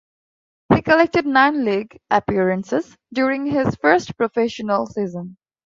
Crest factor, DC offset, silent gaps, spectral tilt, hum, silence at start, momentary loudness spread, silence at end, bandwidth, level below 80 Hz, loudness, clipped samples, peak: 18 dB; under 0.1%; none; -6.5 dB/octave; none; 0.7 s; 10 LU; 0.45 s; 7.6 kHz; -50 dBFS; -19 LUFS; under 0.1%; -2 dBFS